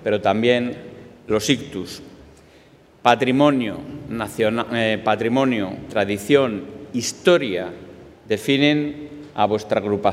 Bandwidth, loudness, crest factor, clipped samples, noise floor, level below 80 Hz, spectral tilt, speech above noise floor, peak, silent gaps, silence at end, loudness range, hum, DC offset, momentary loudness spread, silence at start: 16 kHz; -20 LUFS; 20 dB; under 0.1%; -50 dBFS; -56 dBFS; -5 dB/octave; 30 dB; 0 dBFS; none; 0 s; 2 LU; none; under 0.1%; 16 LU; 0 s